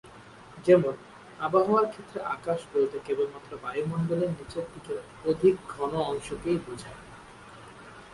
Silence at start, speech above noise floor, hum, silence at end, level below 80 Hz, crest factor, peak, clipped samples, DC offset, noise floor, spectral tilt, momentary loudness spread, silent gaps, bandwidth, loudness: 0.05 s; 22 dB; none; 0 s; -58 dBFS; 22 dB; -8 dBFS; under 0.1%; under 0.1%; -49 dBFS; -7 dB/octave; 24 LU; none; 11.5 kHz; -28 LUFS